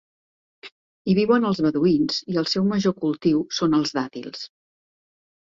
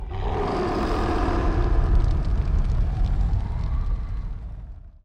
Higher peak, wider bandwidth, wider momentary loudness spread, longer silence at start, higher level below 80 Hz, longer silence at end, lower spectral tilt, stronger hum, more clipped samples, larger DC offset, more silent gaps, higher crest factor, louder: about the same, -8 dBFS vs -10 dBFS; first, 7.8 kHz vs 6.8 kHz; first, 14 LU vs 11 LU; first, 0.65 s vs 0 s; second, -60 dBFS vs -24 dBFS; first, 1.1 s vs 0.15 s; second, -6 dB/octave vs -8 dB/octave; neither; neither; neither; first, 0.72-1.05 s vs none; about the same, 16 dB vs 12 dB; first, -22 LUFS vs -26 LUFS